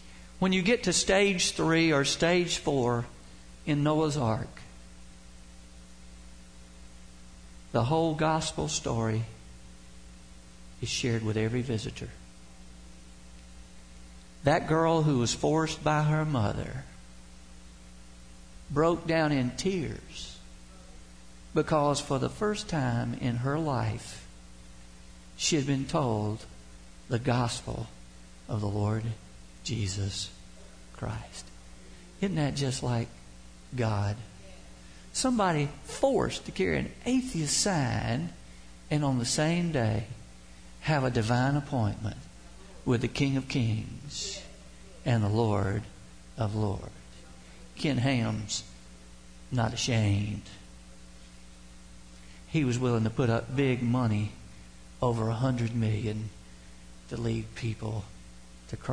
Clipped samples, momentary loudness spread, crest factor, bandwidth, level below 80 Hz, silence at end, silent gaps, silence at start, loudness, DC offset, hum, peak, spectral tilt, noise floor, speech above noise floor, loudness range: under 0.1%; 24 LU; 18 dB; 10.5 kHz; -50 dBFS; 0 s; none; 0 s; -29 LUFS; 0.2%; none; -12 dBFS; -5 dB/octave; -51 dBFS; 22 dB; 6 LU